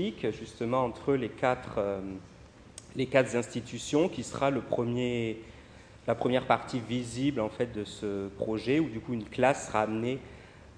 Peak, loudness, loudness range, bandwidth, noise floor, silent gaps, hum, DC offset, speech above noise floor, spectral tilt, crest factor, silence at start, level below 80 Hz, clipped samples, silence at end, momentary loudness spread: -8 dBFS; -31 LUFS; 1 LU; 10.5 kHz; -52 dBFS; none; none; under 0.1%; 22 dB; -5.5 dB/octave; 22 dB; 0 s; -58 dBFS; under 0.1%; 0.05 s; 12 LU